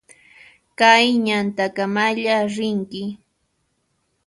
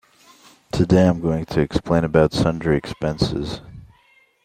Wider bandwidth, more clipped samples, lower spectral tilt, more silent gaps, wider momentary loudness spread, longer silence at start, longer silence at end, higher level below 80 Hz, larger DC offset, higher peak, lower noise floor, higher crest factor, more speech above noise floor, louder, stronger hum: second, 11.5 kHz vs 13 kHz; neither; second, -4 dB/octave vs -7 dB/octave; neither; about the same, 14 LU vs 12 LU; about the same, 0.8 s vs 0.75 s; first, 1.1 s vs 0.6 s; second, -66 dBFS vs -40 dBFS; neither; about the same, 0 dBFS vs -2 dBFS; first, -69 dBFS vs -57 dBFS; about the same, 20 dB vs 18 dB; first, 51 dB vs 38 dB; about the same, -18 LUFS vs -20 LUFS; neither